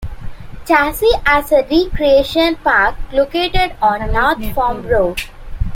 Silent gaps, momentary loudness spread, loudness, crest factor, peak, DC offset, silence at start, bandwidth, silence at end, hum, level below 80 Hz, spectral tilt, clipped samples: none; 14 LU; -14 LUFS; 14 dB; 0 dBFS; under 0.1%; 0 s; 16.5 kHz; 0 s; none; -26 dBFS; -5 dB/octave; under 0.1%